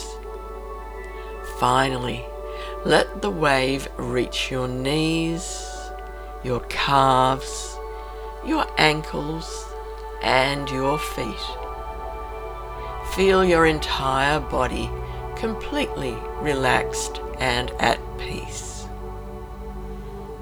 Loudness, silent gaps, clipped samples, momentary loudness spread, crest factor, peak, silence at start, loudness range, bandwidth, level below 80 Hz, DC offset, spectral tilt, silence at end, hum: -23 LUFS; none; under 0.1%; 17 LU; 24 dB; 0 dBFS; 0 s; 4 LU; over 20 kHz; -36 dBFS; under 0.1%; -4.5 dB/octave; 0 s; none